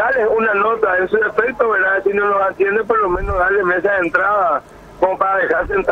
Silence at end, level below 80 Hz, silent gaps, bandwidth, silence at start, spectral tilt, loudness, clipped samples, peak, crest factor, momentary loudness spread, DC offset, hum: 0 s; -36 dBFS; none; 8.2 kHz; 0 s; -7 dB/octave; -16 LUFS; under 0.1%; -2 dBFS; 14 dB; 3 LU; under 0.1%; none